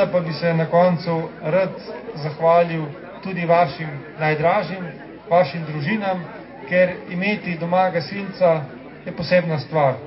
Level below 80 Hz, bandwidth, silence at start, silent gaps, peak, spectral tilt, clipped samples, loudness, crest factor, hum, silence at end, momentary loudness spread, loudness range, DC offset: -58 dBFS; 5.8 kHz; 0 s; none; -4 dBFS; -11 dB/octave; under 0.1%; -20 LUFS; 16 dB; none; 0 s; 15 LU; 2 LU; under 0.1%